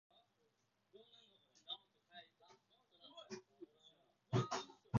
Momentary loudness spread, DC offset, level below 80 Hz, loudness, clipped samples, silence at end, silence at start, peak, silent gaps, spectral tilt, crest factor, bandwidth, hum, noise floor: 27 LU; under 0.1%; -74 dBFS; -46 LUFS; under 0.1%; 0 s; 0.95 s; -22 dBFS; none; -5.5 dB/octave; 26 dB; 7.2 kHz; none; -82 dBFS